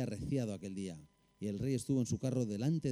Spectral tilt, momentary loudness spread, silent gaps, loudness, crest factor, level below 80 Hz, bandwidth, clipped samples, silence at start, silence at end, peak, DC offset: -7 dB/octave; 10 LU; none; -38 LUFS; 14 dB; -62 dBFS; 14.5 kHz; under 0.1%; 0 s; 0 s; -22 dBFS; under 0.1%